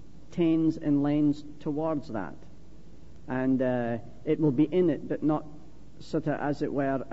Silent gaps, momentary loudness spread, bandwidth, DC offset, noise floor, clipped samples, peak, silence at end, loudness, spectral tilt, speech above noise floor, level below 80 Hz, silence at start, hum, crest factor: none; 11 LU; 7.8 kHz; 0.9%; -52 dBFS; under 0.1%; -14 dBFS; 0 s; -28 LUFS; -9 dB/octave; 24 dB; -56 dBFS; 0.15 s; none; 16 dB